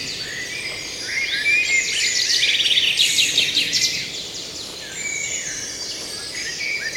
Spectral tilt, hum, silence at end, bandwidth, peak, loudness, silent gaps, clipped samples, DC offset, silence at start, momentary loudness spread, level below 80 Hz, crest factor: 1 dB/octave; none; 0 s; 17 kHz; -4 dBFS; -19 LUFS; none; under 0.1%; under 0.1%; 0 s; 12 LU; -54 dBFS; 18 dB